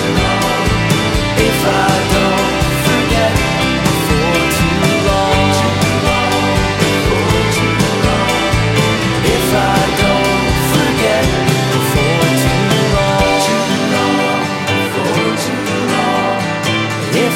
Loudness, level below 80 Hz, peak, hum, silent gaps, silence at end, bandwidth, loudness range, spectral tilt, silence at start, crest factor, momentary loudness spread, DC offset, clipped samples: -13 LUFS; -28 dBFS; 0 dBFS; none; none; 0 s; 16.5 kHz; 1 LU; -4.5 dB/octave; 0 s; 12 dB; 3 LU; under 0.1%; under 0.1%